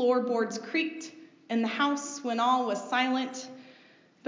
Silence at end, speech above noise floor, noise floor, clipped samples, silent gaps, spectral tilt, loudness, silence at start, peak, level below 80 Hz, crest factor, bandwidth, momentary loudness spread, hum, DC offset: 0 s; 30 dB; -59 dBFS; under 0.1%; none; -3 dB/octave; -29 LUFS; 0 s; -14 dBFS; under -90 dBFS; 16 dB; 7.6 kHz; 16 LU; none; under 0.1%